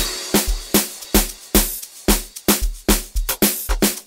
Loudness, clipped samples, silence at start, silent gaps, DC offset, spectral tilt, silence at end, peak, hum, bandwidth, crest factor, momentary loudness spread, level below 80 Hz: -19 LUFS; under 0.1%; 0 s; none; under 0.1%; -3 dB/octave; 0.05 s; 0 dBFS; none; 16.5 kHz; 20 dB; 2 LU; -26 dBFS